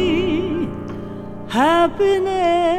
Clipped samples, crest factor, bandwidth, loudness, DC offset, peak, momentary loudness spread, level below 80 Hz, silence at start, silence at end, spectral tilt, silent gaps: under 0.1%; 14 dB; 14.5 kHz; -18 LUFS; under 0.1%; -4 dBFS; 15 LU; -42 dBFS; 0 s; 0 s; -6 dB/octave; none